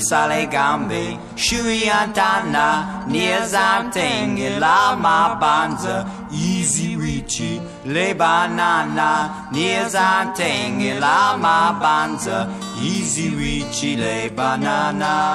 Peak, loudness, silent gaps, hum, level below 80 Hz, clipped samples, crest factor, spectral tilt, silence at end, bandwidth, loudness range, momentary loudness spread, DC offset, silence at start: -2 dBFS; -18 LUFS; none; none; -44 dBFS; under 0.1%; 16 dB; -3.5 dB/octave; 0 s; 13 kHz; 3 LU; 8 LU; under 0.1%; 0 s